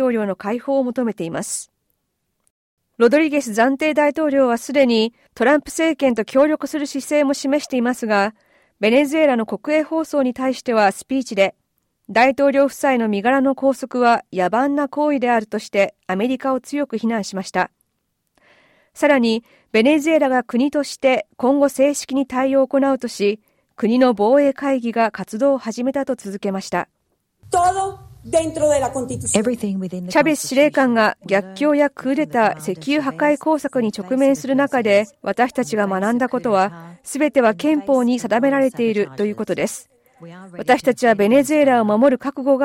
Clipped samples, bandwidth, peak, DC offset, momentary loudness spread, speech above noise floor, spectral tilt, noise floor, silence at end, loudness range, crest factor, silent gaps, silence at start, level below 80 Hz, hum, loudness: under 0.1%; 16.5 kHz; -2 dBFS; under 0.1%; 8 LU; 55 dB; -4.5 dB/octave; -73 dBFS; 0 s; 4 LU; 16 dB; 2.50-2.77 s; 0 s; -58 dBFS; none; -18 LUFS